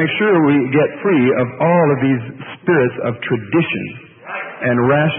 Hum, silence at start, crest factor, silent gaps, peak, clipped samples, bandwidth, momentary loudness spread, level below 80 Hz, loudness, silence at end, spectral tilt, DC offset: none; 0 s; 14 dB; none; -2 dBFS; under 0.1%; 3.7 kHz; 13 LU; -56 dBFS; -16 LUFS; 0 s; -12.5 dB/octave; under 0.1%